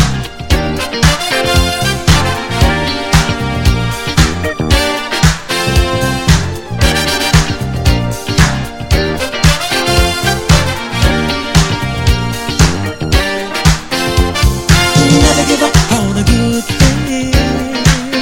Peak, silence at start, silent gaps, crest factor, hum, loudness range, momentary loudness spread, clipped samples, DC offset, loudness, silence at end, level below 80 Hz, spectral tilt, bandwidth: 0 dBFS; 0 s; none; 12 dB; none; 3 LU; 5 LU; 0.4%; under 0.1%; -12 LUFS; 0 s; -18 dBFS; -4.5 dB/octave; 17 kHz